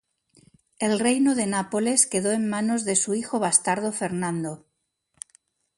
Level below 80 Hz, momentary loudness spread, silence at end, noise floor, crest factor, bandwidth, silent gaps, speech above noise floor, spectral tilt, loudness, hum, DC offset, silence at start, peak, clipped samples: -68 dBFS; 19 LU; 1.2 s; -72 dBFS; 22 dB; 11.5 kHz; none; 49 dB; -3.5 dB/octave; -23 LUFS; none; under 0.1%; 0.8 s; -4 dBFS; under 0.1%